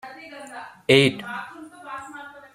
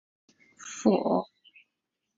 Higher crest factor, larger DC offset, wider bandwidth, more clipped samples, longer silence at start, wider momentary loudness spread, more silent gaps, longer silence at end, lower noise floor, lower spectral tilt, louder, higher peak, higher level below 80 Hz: about the same, 24 dB vs 22 dB; neither; first, 14.5 kHz vs 7.8 kHz; neither; second, 0.05 s vs 0.6 s; first, 23 LU vs 20 LU; neither; second, 0.25 s vs 0.95 s; second, -41 dBFS vs -84 dBFS; about the same, -5 dB/octave vs -6 dB/octave; first, -20 LUFS vs -27 LUFS; first, -2 dBFS vs -8 dBFS; first, -62 dBFS vs -72 dBFS